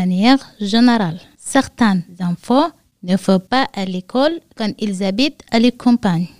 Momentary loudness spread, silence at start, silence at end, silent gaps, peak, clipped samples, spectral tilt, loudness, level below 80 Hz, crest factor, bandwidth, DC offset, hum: 10 LU; 0 s; 0.1 s; none; 0 dBFS; under 0.1%; -5.5 dB/octave; -17 LUFS; -50 dBFS; 16 dB; 15 kHz; 0.9%; none